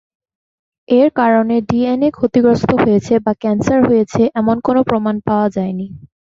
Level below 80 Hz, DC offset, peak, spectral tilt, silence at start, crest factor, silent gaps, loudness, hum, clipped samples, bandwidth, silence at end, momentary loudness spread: -46 dBFS; under 0.1%; 0 dBFS; -7.5 dB/octave; 0.9 s; 14 dB; none; -14 LUFS; none; under 0.1%; 7.6 kHz; 0.25 s; 5 LU